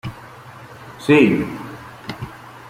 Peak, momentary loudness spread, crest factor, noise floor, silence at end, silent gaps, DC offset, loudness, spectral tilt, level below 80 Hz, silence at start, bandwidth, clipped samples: -2 dBFS; 26 LU; 20 dB; -39 dBFS; 0 s; none; under 0.1%; -16 LUFS; -7 dB/octave; -52 dBFS; 0.05 s; 15.5 kHz; under 0.1%